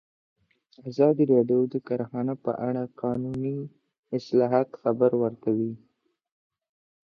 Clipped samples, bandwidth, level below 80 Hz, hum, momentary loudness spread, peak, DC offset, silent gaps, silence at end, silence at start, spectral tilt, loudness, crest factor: under 0.1%; 6.6 kHz; -68 dBFS; none; 12 LU; -8 dBFS; under 0.1%; 3.98-4.03 s; 1.25 s; 0.85 s; -9.5 dB/octave; -26 LUFS; 18 dB